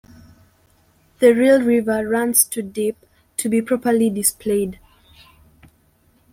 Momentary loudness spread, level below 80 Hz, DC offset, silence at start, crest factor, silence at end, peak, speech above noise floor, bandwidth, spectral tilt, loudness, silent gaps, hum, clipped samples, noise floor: 11 LU; -56 dBFS; under 0.1%; 1.2 s; 20 dB; 1.6 s; 0 dBFS; 41 dB; 16.5 kHz; -4 dB/octave; -18 LUFS; none; none; under 0.1%; -58 dBFS